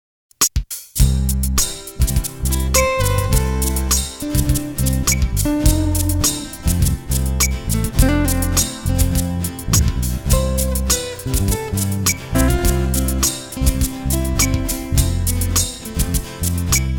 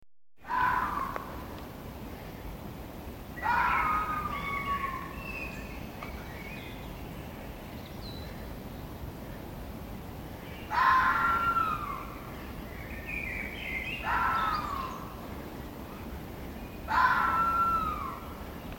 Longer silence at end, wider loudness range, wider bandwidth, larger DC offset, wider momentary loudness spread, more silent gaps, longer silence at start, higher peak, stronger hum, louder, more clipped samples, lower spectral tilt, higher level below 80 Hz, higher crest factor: about the same, 0 s vs 0 s; second, 1 LU vs 12 LU; first, over 20 kHz vs 17 kHz; neither; second, 5 LU vs 17 LU; neither; first, 0.4 s vs 0 s; first, 0 dBFS vs -12 dBFS; neither; first, -18 LUFS vs -32 LUFS; neither; about the same, -4 dB/octave vs -5 dB/octave; first, -22 dBFS vs -46 dBFS; about the same, 18 dB vs 20 dB